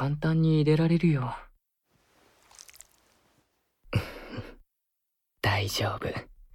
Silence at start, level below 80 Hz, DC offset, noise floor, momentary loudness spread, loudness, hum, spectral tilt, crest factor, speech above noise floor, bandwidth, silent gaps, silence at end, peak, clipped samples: 0 s; -52 dBFS; under 0.1%; -82 dBFS; 22 LU; -27 LUFS; none; -6.5 dB/octave; 18 dB; 57 dB; 16.5 kHz; none; 0.3 s; -12 dBFS; under 0.1%